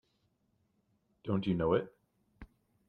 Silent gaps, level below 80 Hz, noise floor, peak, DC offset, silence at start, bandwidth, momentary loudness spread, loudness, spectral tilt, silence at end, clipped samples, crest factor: none; -62 dBFS; -77 dBFS; -16 dBFS; under 0.1%; 1.25 s; 4.9 kHz; 17 LU; -33 LUFS; -9.5 dB/octave; 0.45 s; under 0.1%; 20 dB